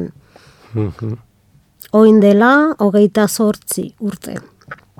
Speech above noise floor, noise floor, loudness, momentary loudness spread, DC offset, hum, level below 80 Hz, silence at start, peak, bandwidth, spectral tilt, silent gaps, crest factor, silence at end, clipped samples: 40 dB; -53 dBFS; -13 LUFS; 20 LU; under 0.1%; none; -54 dBFS; 0 s; 0 dBFS; 17 kHz; -6 dB/octave; none; 14 dB; 0.25 s; under 0.1%